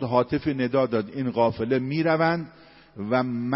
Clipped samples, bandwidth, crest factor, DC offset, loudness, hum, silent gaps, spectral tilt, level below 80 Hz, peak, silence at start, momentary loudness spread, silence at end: under 0.1%; 5.8 kHz; 18 dB; under 0.1%; -24 LUFS; none; none; -11 dB/octave; -56 dBFS; -6 dBFS; 0 s; 6 LU; 0 s